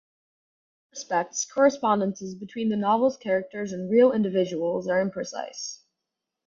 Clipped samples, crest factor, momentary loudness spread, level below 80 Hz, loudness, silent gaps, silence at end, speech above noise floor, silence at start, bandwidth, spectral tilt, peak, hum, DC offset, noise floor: under 0.1%; 20 dB; 15 LU; -70 dBFS; -25 LUFS; none; 0.7 s; 60 dB; 0.95 s; 7.6 kHz; -5 dB/octave; -6 dBFS; none; under 0.1%; -85 dBFS